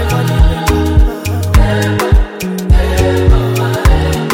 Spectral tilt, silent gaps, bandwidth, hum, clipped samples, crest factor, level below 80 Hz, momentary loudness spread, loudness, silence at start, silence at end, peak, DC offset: -6 dB/octave; none; 17 kHz; none; under 0.1%; 10 dB; -12 dBFS; 3 LU; -12 LUFS; 0 s; 0 s; 0 dBFS; under 0.1%